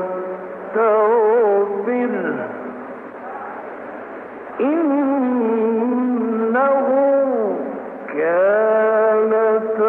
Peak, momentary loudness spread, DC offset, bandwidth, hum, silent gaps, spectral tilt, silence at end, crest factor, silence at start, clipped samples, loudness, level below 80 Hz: -6 dBFS; 17 LU; under 0.1%; 3.6 kHz; none; none; -9.5 dB/octave; 0 s; 12 dB; 0 s; under 0.1%; -18 LUFS; -70 dBFS